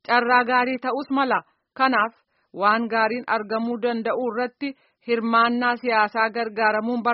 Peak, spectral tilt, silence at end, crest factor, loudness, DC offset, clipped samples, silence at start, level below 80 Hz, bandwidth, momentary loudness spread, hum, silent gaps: -4 dBFS; -1.5 dB/octave; 0 s; 18 dB; -22 LUFS; under 0.1%; under 0.1%; 0.1 s; -72 dBFS; 5.8 kHz; 8 LU; none; none